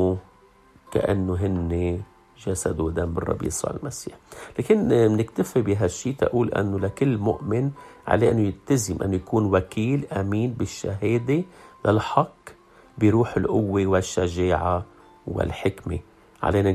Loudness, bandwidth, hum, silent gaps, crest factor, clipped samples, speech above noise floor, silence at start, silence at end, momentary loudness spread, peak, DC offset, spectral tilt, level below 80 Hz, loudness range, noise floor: -24 LUFS; 14 kHz; none; none; 22 dB; under 0.1%; 32 dB; 0 s; 0 s; 12 LU; -2 dBFS; under 0.1%; -6.5 dB/octave; -48 dBFS; 3 LU; -54 dBFS